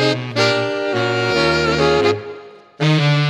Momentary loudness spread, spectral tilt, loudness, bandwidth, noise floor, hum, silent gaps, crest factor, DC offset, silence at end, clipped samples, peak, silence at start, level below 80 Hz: 7 LU; -5.5 dB/octave; -17 LUFS; 11 kHz; -37 dBFS; none; none; 16 dB; under 0.1%; 0 s; under 0.1%; 0 dBFS; 0 s; -44 dBFS